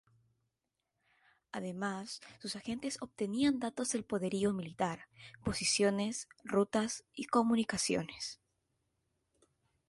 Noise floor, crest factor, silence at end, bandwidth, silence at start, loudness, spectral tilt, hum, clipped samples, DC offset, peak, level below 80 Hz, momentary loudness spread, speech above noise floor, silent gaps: -87 dBFS; 20 dB; 1.55 s; 12 kHz; 1.55 s; -35 LUFS; -4 dB/octave; none; under 0.1%; under 0.1%; -18 dBFS; -66 dBFS; 13 LU; 51 dB; none